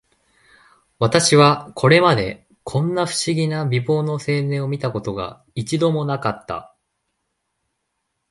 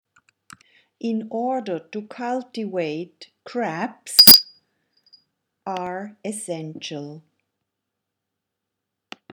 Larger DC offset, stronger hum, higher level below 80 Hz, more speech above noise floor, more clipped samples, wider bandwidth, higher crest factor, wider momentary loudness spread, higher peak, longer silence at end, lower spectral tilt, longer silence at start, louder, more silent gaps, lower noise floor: neither; neither; first, -52 dBFS vs -58 dBFS; second, 56 dB vs 61 dB; neither; second, 11.5 kHz vs 19.5 kHz; about the same, 20 dB vs 24 dB; second, 16 LU vs 25 LU; about the same, 0 dBFS vs 0 dBFS; second, 1.65 s vs 2.15 s; first, -5 dB/octave vs -2 dB/octave; about the same, 1 s vs 1.05 s; second, -19 LUFS vs -16 LUFS; neither; second, -75 dBFS vs -82 dBFS